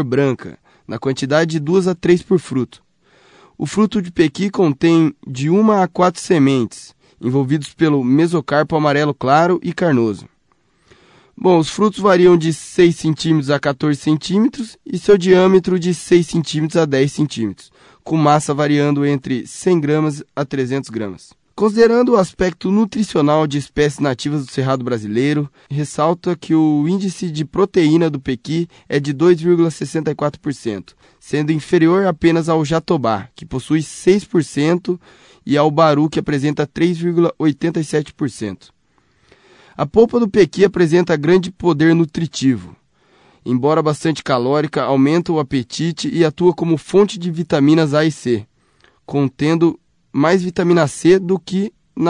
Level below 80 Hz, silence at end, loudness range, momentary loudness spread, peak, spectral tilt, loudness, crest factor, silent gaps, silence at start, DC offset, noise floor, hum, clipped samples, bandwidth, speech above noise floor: -50 dBFS; 0 s; 3 LU; 10 LU; -2 dBFS; -6.5 dB/octave; -16 LUFS; 14 dB; none; 0 s; under 0.1%; -60 dBFS; none; under 0.1%; 11 kHz; 45 dB